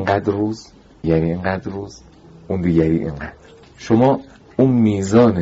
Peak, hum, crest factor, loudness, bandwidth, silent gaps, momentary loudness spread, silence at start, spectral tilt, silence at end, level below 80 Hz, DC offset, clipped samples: -2 dBFS; none; 16 dB; -18 LUFS; 8 kHz; none; 17 LU; 0 s; -7.5 dB/octave; 0 s; -42 dBFS; under 0.1%; under 0.1%